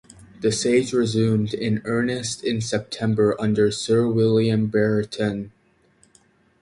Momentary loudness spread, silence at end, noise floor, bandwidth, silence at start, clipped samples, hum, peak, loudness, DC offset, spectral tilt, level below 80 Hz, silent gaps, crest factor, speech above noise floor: 7 LU; 1.1 s; -60 dBFS; 11.5 kHz; 0.2 s; under 0.1%; none; -6 dBFS; -22 LUFS; under 0.1%; -5.5 dB/octave; -54 dBFS; none; 16 dB; 39 dB